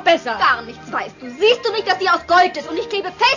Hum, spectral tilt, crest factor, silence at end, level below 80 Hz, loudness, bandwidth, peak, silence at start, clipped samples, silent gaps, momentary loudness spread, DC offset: none; -2.5 dB/octave; 16 dB; 0 s; -54 dBFS; -17 LUFS; 7.4 kHz; -2 dBFS; 0 s; under 0.1%; none; 11 LU; under 0.1%